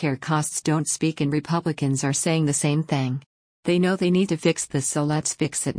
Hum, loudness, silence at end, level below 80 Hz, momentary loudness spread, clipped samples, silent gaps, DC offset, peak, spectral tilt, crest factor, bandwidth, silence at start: none; -23 LUFS; 0 s; -60 dBFS; 4 LU; under 0.1%; 3.26-3.63 s; under 0.1%; -8 dBFS; -5 dB/octave; 14 dB; 10.5 kHz; 0 s